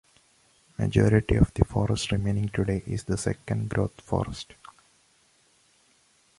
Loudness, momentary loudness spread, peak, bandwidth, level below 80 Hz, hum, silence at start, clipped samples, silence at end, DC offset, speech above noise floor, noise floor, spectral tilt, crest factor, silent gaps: -26 LUFS; 10 LU; -4 dBFS; 11.5 kHz; -40 dBFS; none; 0.8 s; under 0.1%; 1.95 s; under 0.1%; 39 dB; -64 dBFS; -6.5 dB/octave; 24 dB; none